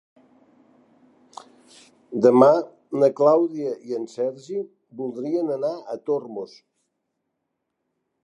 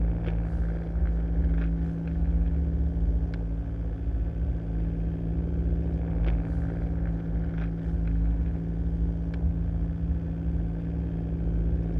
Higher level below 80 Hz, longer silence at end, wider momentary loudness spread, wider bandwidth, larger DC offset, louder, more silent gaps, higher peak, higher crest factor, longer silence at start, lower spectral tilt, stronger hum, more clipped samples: second, -80 dBFS vs -28 dBFS; first, 1.8 s vs 0 s; first, 17 LU vs 3 LU; first, 11 kHz vs 3.5 kHz; neither; first, -22 LUFS vs -30 LUFS; neither; first, -2 dBFS vs -14 dBFS; first, 22 dB vs 12 dB; first, 2.1 s vs 0 s; second, -7.5 dB/octave vs -11 dB/octave; neither; neither